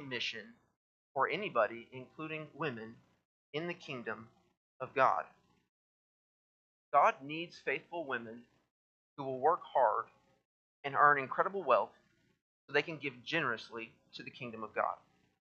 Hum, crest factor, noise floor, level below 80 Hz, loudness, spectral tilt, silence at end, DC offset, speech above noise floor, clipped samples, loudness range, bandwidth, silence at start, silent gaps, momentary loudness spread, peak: none; 26 dB; under -90 dBFS; -86 dBFS; -35 LUFS; -5 dB/octave; 0.5 s; under 0.1%; over 55 dB; under 0.1%; 6 LU; 7.8 kHz; 0 s; 0.76-1.15 s, 3.25-3.53 s, 4.57-4.80 s, 5.69-6.92 s, 8.71-9.17 s, 10.45-10.83 s, 12.41-12.68 s; 19 LU; -12 dBFS